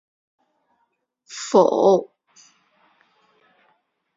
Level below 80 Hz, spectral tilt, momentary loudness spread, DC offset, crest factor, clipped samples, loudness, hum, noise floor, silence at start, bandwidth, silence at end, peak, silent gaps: -72 dBFS; -5.5 dB/octave; 22 LU; under 0.1%; 22 dB; under 0.1%; -18 LUFS; none; -72 dBFS; 1.3 s; 7.8 kHz; 2.1 s; -2 dBFS; none